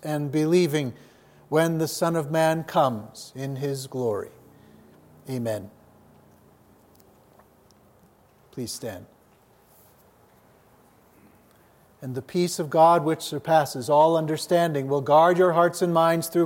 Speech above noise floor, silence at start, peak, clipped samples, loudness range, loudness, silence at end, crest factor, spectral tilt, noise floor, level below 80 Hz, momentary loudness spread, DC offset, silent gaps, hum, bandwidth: 36 dB; 0 s; -6 dBFS; under 0.1%; 20 LU; -23 LUFS; 0 s; 18 dB; -5.5 dB/octave; -58 dBFS; -70 dBFS; 17 LU; under 0.1%; none; none; 16.5 kHz